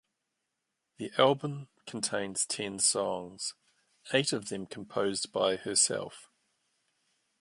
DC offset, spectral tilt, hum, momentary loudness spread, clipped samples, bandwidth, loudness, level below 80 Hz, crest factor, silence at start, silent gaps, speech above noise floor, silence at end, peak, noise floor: under 0.1%; -2.5 dB/octave; none; 13 LU; under 0.1%; 11.5 kHz; -30 LUFS; -74 dBFS; 24 dB; 1 s; none; 53 dB; 1.15 s; -10 dBFS; -84 dBFS